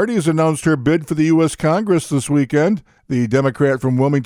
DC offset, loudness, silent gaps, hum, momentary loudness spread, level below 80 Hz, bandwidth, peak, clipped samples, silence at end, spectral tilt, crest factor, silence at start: under 0.1%; -17 LUFS; none; none; 3 LU; -50 dBFS; 14 kHz; -2 dBFS; under 0.1%; 0 s; -6.5 dB/octave; 14 dB; 0 s